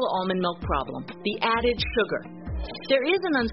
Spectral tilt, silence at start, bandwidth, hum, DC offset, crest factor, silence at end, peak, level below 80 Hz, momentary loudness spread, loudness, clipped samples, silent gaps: -3 dB/octave; 0 s; 5.8 kHz; none; 0.2%; 18 dB; 0 s; -8 dBFS; -40 dBFS; 11 LU; -26 LUFS; under 0.1%; none